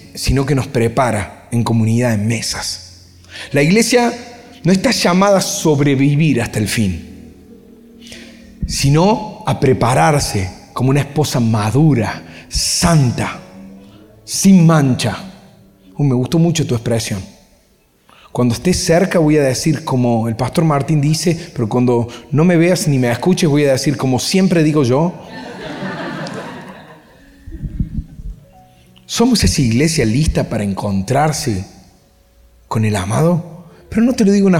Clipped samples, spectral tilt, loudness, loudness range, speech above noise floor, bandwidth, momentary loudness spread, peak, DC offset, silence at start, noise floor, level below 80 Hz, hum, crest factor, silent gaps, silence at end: under 0.1%; -5.5 dB/octave; -15 LUFS; 5 LU; 40 dB; 16.5 kHz; 16 LU; -2 dBFS; under 0.1%; 0 s; -54 dBFS; -34 dBFS; none; 14 dB; none; 0 s